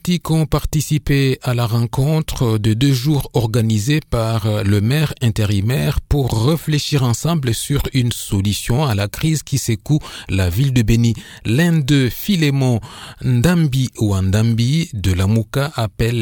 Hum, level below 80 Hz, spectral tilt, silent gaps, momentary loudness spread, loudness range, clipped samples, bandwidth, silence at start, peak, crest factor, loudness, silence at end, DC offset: none; -32 dBFS; -6 dB/octave; none; 4 LU; 2 LU; under 0.1%; 19.5 kHz; 0.05 s; 0 dBFS; 16 dB; -17 LUFS; 0 s; under 0.1%